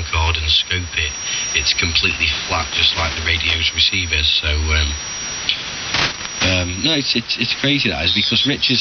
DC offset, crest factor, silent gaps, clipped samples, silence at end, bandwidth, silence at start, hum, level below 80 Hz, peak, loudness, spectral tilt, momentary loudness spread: under 0.1%; 18 dB; none; under 0.1%; 0 s; 7 kHz; 0 s; none; -32 dBFS; 0 dBFS; -16 LUFS; -2.5 dB/octave; 6 LU